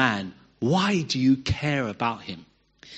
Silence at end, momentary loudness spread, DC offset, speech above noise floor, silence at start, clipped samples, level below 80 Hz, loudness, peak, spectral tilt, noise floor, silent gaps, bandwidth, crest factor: 0 s; 16 LU; under 0.1%; 25 dB; 0 s; under 0.1%; -50 dBFS; -25 LUFS; -4 dBFS; -5.5 dB/octave; -49 dBFS; none; 8.6 kHz; 20 dB